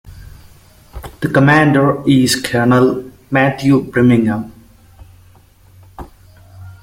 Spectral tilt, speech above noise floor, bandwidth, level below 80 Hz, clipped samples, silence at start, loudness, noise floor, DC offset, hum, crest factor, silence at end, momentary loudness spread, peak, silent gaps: -6 dB/octave; 34 dB; 16.5 kHz; -42 dBFS; under 0.1%; 0.05 s; -13 LUFS; -46 dBFS; under 0.1%; none; 16 dB; 0.1 s; 14 LU; 0 dBFS; none